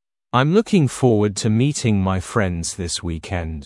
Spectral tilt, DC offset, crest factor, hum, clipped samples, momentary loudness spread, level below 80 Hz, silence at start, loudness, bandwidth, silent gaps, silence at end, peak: -5.5 dB/octave; under 0.1%; 18 dB; none; under 0.1%; 9 LU; -44 dBFS; 0.35 s; -19 LUFS; 12 kHz; none; 0 s; -2 dBFS